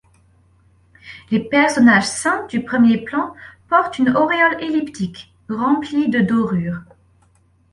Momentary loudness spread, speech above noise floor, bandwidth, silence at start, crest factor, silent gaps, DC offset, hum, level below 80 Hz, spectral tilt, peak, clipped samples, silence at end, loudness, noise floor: 15 LU; 39 dB; 11.5 kHz; 1.05 s; 16 dB; none; under 0.1%; none; -54 dBFS; -5 dB/octave; -2 dBFS; under 0.1%; 0.9 s; -17 LUFS; -56 dBFS